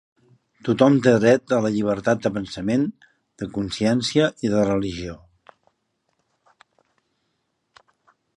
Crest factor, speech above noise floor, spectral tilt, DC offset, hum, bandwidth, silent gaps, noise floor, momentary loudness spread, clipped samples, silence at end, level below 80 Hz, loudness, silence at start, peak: 22 dB; 53 dB; -6 dB/octave; under 0.1%; none; 11 kHz; none; -73 dBFS; 14 LU; under 0.1%; 3.2 s; -52 dBFS; -21 LUFS; 0.65 s; -2 dBFS